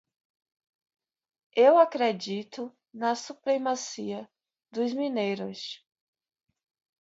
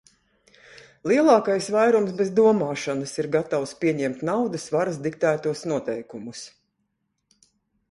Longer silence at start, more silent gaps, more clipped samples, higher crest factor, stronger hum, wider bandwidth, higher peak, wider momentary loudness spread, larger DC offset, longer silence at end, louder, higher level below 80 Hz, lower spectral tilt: first, 1.55 s vs 0.75 s; neither; neither; about the same, 22 dB vs 18 dB; neither; second, 8 kHz vs 11.5 kHz; about the same, -8 dBFS vs -6 dBFS; first, 19 LU vs 15 LU; neither; second, 1.25 s vs 1.45 s; second, -27 LUFS vs -23 LUFS; second, -82 dBFS vs -66 dBFS; second, -4 dB/octave vs -5.5 dB/octave